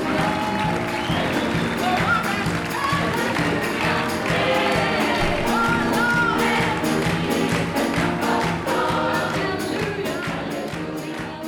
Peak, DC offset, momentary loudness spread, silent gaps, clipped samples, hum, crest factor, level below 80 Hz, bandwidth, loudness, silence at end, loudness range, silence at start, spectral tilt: -8 dBFS; under 0.1%; 6 LU; none; under 0.1%; none; 14 dB; -42 dBFS; 19.5 kHz; -21 LUFS; 0 s; 3 LU; 0 s; -5 dB/octave